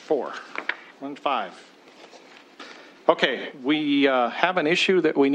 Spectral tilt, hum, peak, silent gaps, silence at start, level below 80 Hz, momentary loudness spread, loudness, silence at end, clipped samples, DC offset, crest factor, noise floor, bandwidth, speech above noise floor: -4.5 dB/octave; none; -2 dBFS; none; 0 s; -78 dBFS; 18 LU; -23 LUFS; 0 s; under 0.1%; under 0.1%; 22 dB; -49 dBFS; 9.4 kHz; 26 dB